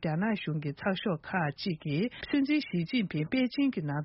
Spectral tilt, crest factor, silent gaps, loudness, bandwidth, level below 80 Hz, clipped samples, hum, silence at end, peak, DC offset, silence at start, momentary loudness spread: -5.5 dB/octave; 14 dB; none; -31 LUFS; 5.8 kHz; -64 dBFS; under 0.1%; none; 0 s; -16 dBFS; under 0.1%; 0 s; 5 LU